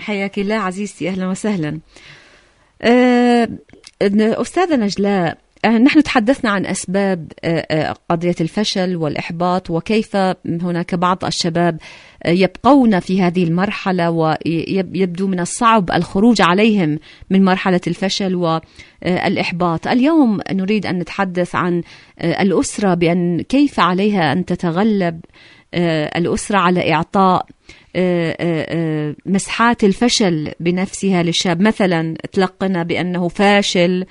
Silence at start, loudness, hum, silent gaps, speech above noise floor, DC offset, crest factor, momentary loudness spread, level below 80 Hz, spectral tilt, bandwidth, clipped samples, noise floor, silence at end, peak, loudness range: 0 s; -16 LUFS; none; none; 35 dB; under 0.1%; 16 dB; 8 LU; -46 dBFS; -5.5 dB/octave; 11 kHz; under 0.1%; -51 dBFS; 0.05 s; 0 dBFS; 3 LU